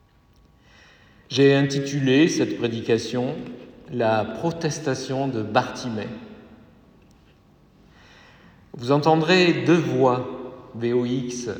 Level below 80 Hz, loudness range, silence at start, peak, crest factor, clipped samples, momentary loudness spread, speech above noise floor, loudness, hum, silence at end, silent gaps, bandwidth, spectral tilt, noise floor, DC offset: -60 dBFS; 9 LU; 1.3 s; -4 dBFS; 20 dB; under 0.1%; 16 LU; 35 dB; -22 LUFS; none; 0 s; none; 10 kHz; -5.5 dB/octave; -56 dBFS; under 0.1%